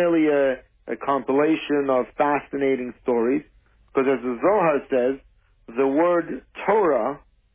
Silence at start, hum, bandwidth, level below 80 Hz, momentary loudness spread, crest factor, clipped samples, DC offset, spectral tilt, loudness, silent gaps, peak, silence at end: 0 s; none; 3.7 kHz; -58 dBFS; 10 LU; 14 dB; under 0.1%; under 0.1%; -10 dB/octave; -22 LUFS; none; -8 dBFS; 0.35 s